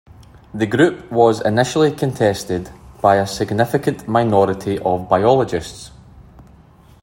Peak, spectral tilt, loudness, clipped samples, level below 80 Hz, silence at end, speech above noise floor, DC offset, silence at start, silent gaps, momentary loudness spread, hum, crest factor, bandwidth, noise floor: 0 dBFS; -6 dB/octave; -17 LUFS; under 0.1%; -48 dBFS; 0.6 s; 30 dB; under 0.1%; 0.2 s; none; 11 LU; none; 16 dB; 16.5 kHz; -46 dBFS